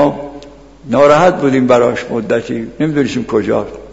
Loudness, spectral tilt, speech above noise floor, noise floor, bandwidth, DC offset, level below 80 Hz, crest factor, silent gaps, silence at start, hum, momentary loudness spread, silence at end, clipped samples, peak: -13 LUFS; -6.5 dB/octave; 23 dB; -35 dBFS; 8 kHz; under 0.1%; -44 dBFS; 14 dB; none; 0 s; none; 10 LU; 0 s; under 0.1%; 0 dBFS